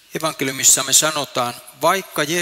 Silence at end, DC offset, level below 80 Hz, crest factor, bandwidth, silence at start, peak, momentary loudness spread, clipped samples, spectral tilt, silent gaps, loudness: 0 s; under 0.1%; -62 dBFS; 18 dB; 16.5 kHz; 0.15 s; -2 dBFS; 11 LU; under 0.1%; -1 dB/octave; none; -16 LUFS